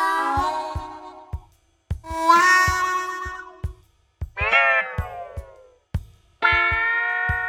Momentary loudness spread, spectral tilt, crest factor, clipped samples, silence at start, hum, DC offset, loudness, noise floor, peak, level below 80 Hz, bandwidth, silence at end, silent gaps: 22 LU; -3.5 dB/octave; 20 dB; under 0.1%; 0 s; none; under 0.1%; -19 LUFS; -56 dBFS; -4 dBFS; -38 dBFS; 18 kHz; 0 s; none